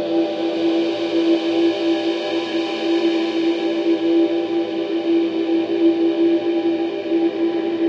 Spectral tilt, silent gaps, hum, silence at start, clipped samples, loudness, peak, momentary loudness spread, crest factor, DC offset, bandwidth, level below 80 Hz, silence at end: -5.5 dB/octave; none; none; 0 s; under 0.1%; -19 LUFS; -6 dBFS; 4 LU; 12 dB; under 0.1%; 7 kHz; -68 dBFS; 0 s